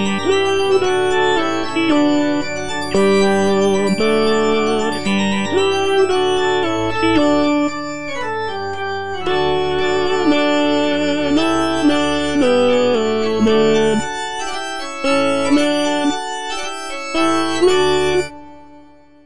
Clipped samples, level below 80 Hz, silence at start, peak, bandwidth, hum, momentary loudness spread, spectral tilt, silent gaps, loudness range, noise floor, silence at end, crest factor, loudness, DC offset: under 0.1%; -44 dBFS; 0 s; -4 dBFS; 10.5 kHz; none; 9 LU; -4.5 dB/octave; none; 3 LU; -45 dBFS; 0 s; 14 dB; -17 LUFS; 4%